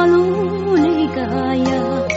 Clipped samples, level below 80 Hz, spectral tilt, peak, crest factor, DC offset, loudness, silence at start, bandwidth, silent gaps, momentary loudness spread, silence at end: under 0.1%; -44 dBFS; -5.5 dB/octave; -4 dBFS; 10 dB; under 0.1%; -17 LUFS; 0 s; 7.8 kHz; none; 5 LU; 0 s